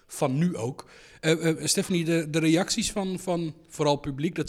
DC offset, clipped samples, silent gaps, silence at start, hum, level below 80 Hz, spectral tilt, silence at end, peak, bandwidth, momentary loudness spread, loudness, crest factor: under 0.1%; under 0.1%; none; 0.1 s; none; -54 dBFS; -4.5 dB/octave; 0 s; -10 dBFS; 16 kHz; 8 LU; -26 LUFS; 18 dB